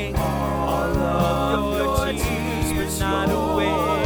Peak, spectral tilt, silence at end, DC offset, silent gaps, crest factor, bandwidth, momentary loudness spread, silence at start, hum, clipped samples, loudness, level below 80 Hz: -6 dBFS; -5.5 dB/octave; 0 s; under 0.1%; none; 14 dB; over 20 kHz; 3 LU; 0 s; none; under 0.1%; -22 LUFS; -30 dBFS